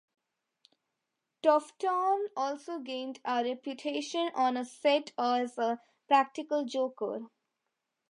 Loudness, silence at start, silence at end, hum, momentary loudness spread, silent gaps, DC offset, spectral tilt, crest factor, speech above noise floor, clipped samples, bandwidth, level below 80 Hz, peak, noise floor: -31 LUFS; 1.45 s; 0.85 s; none; 10 LU; none; under 0.1%; -3 dB/octave; 20 dB; 55 dB; under 0.1%; 11 kHz; under -90 dBFS; -12 dBFS; -85 dBFS